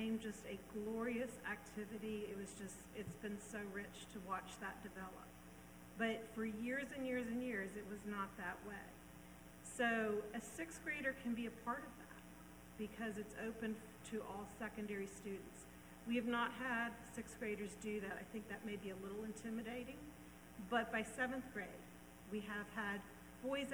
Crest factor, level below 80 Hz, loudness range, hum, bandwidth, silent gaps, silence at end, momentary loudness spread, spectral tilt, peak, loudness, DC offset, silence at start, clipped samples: 22 dB; -68 dBFS; 5 LU; 60 Hz at -65 dBFS; over 20 kHz; none; 0 s; 16 LU; -4.5 dB/octave; -26 dBFS; -46 LUFS; under 0.1%; 0 s; under 0.1%